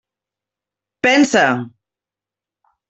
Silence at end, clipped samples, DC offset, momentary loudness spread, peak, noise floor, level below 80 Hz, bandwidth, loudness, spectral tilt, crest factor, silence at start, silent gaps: 1.2 s; under 0.1%; under 0.1%; 13 LU; -2 dBFS; -88 dBFS; -64 dBFS; 8.2 kHz; -15 LUFS; -3.5 dB/octave; 18 dB; 1.05 s; none